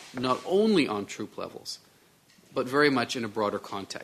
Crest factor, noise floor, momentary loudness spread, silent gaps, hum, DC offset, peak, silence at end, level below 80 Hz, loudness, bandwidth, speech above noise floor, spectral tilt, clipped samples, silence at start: 20 dB; -60 dBFS; 15 LU; none; none; under 0.1%; -8 dBFS; 0 s; -68 dBFS; -28 LUFS; 14 kHz; 33 dB; -4.5 dB/octave; under 0.1%; 0 s